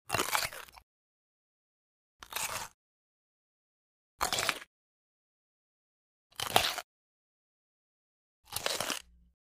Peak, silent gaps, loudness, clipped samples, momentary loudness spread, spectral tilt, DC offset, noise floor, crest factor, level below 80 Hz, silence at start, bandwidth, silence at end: -6 dBFS; 0.83-2.19 s, 2.74-4.18 s, 4.67-6.30 s, 6.84-8.43 s; -33 LUFS; under 0.1%; 16 LU; -1 dB/octave; under 0.1%; under -90 dBFS; 34 dB; -64 dBFS; 0.1 s; 16 kHz; 0.4 s